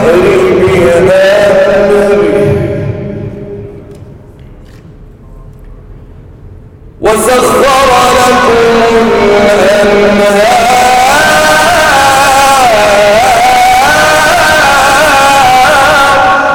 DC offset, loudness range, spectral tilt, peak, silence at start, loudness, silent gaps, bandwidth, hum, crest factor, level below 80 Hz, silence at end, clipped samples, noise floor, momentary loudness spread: under 0.1%; 11 LU; -3.5 dB/octave; 0 dBFS; 0 s; -5 LUFS; none; over 20 kHz; none; 6 dB; -30 dBFS; 0 s; under 0.1%; -31 dBFS; 5 LU